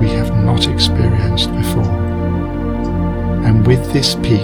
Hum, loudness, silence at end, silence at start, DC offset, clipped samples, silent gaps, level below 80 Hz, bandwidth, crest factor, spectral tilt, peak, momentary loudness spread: none; -15 LUFS; 0 s; 0 s; under 0.1%; under 0.1%; none; -24 dBFS; 19 kHz; 14 dB; -6 dB/octave; 0 dBFS; 6 LU